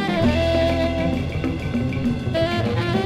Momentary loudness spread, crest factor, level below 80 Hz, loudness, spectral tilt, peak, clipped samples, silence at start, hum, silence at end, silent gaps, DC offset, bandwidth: 5 LU; 14 dB; -34 dBFS; -22 LUFS; -7 dB/octave; -8 dBFS; under 0.1%; 0 s; none; 0 s; none; under 0.1%; 13.5 kHz